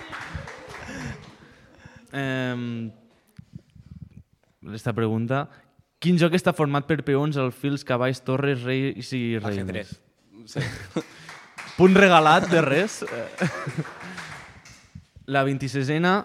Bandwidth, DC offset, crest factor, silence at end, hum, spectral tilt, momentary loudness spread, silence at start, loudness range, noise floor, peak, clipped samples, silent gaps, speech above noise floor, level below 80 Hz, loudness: 14.5 kHz; under 0.1%; 22 dB; 0 s; none; -6 dB/octave; 20 LU; 0 s; 13 LU; -52 dBFS; -2 dBFS; under 0.1%; none; 30 dB; -56 dBFS; -23 LUFS